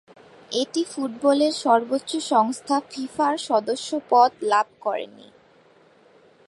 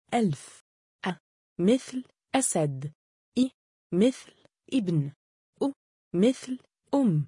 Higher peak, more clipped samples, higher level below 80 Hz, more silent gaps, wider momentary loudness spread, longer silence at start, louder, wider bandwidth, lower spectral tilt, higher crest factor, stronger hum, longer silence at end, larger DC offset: first, -4 dBFS vs -12 dBFS; neither; about the same, -74 dBFS vs -70 dBFS; second, none vs 0.61-0.99 s, 1.20-1.56 s, 2.95-3.32 s, 3.54-3.90 s, 5.16-5.53 s, 5.76-6.11 s; second, 10 LU vs 14 LU; first, 0.5 s vs 0.1 s; first, -23 LUFS vs -29 LUFS; about the same, 11.5 kHz vs 11 kHz; second, -3 dB/octave vs -5.5 dB/octave; about the same, 20 dB vs 18 dB; neither; first, 1.4 s vs 0 s; neither